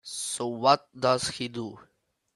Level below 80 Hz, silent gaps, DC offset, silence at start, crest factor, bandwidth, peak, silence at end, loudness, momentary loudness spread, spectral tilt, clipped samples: -66 dBFS; none; under 0.1%; 0.05 s; 24 dB; 12.5 kHz; -6 dBFS; 0.55 s; -27 LUFS; 12 LU; -3.5 dB/octave; under 0.1%